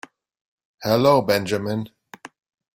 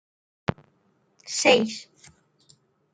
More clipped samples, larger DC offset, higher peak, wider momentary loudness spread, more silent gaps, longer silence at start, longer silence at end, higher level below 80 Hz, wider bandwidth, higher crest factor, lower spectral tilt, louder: neither; neither; about the same, -2 dBFS vs -2 dBFS; second, 14 LU vs 18 LU; neither; first, 0.8 s vs 0.5 s; second, 0.45 s vs 1.1 s; about the same, -60 dBFS vs -64 dBFS; first, 16.5 kHz vs 9.6 kHz; second, 20 dB vs 26 dB; first, -5.5 dB/octave vs -3 dB/octave; first, -20 LUFS vs -23 LUFS